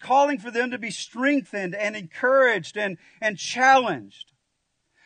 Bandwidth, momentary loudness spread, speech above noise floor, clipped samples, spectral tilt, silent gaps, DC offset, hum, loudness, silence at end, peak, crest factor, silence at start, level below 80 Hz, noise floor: 9.6 kHz; 13 LU; 52 dB; under 0.1%; -3.5 dB/octave; none; under 0.1%; none; -23 LUFS; 1 s; -6 dBFS; 18 dB; 0 s; -78 dBFS; -75 dBFS